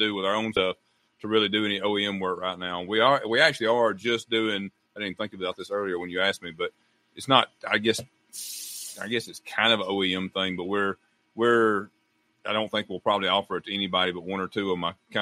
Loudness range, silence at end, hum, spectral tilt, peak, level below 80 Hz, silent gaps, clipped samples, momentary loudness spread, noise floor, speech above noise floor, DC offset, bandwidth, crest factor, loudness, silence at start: 4 LU; 0 s; none; -3.5 dB/octave; -2 dBFS; -68 dBFS; none; under 0.1%; 13 LU; -70 dBFS; 44 dB; under 0.1%; 16 kHz; 24 dB; -26 LUFS; 0 s